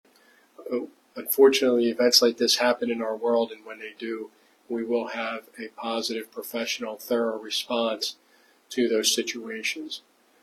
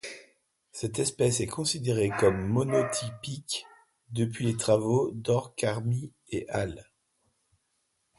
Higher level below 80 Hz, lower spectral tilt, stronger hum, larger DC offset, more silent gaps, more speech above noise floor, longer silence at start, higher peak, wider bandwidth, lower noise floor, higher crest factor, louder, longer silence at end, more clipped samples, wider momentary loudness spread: second, -80 dBFS vs -56 dBFS; second, -1.5 dB/octave vs -5 dB/octave; neither; neither; neither; second, 34 dB vs 48 dB; first, 0.6 s vs 0.05 s; first, -2 dBFS vs -10 dBFS; first, 15 kHz vs 12 kHz; second, -59 dBFS vs -76 dBFS; about the same, 24 dB vs 20 dB; first, -25 LUFS vs -29 LUFS; second, 0.45 s vs 1.35 s; neither; first, 18 LU vs 12 LU